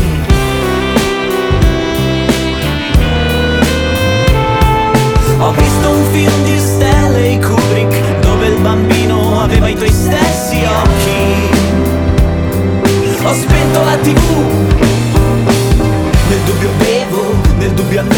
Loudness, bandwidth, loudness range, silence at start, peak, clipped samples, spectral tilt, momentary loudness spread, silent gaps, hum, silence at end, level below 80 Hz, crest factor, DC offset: -11 LUFS; over 20 kHz; 1 LU; 0 s; 0 dBFS; under 0.1%; -5.5 dB/octave; 3 LU; none; none; 0 s; -18 dBFS; 10 dB; under 0.1%